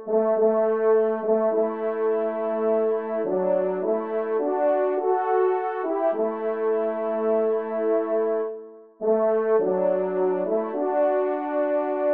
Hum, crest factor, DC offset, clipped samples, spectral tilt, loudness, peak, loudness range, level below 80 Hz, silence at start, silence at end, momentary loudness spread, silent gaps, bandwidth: none; 12 dB; 0.1%; under 0.1%; -6.5 dB/octave; -24 LUFS; -10 dBFS; 1 LU; -78 dBFS; 0 s; 0 s; 5 LU; none; 3.5 kHz